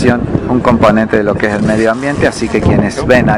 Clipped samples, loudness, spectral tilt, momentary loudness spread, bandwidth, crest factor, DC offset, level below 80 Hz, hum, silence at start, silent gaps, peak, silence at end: 2%; -11 LUFS; -6.5 dB/octave; 4 LU; 11 kHz; 10 dB; under 0.1%; -28 dBFS; none; 0 s; none; 0 dBFS; 0 s